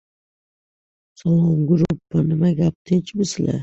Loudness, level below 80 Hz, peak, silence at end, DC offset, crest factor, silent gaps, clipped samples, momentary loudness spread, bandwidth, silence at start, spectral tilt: -20 LUFS; -48 dBFS; -6 dBFS; 0 s; under 0.1%; 14 dB; 2.75-2.85 s; under 0.1%; 5 LU; 8 kHz; 1.25 s; -7.5 dB/octave